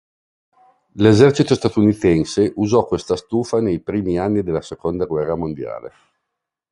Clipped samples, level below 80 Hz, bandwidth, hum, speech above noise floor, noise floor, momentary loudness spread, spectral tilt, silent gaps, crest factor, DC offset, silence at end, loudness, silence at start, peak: under 0.1%; -44 dBFS; 11.5 kHz; none; 63 dB; -80 dBFS; 11 LU; -7 dB/octave; none; 18 dB; under 0.1%; 0.85 s; -18 LUFS; 0.95 s; 0 dBFS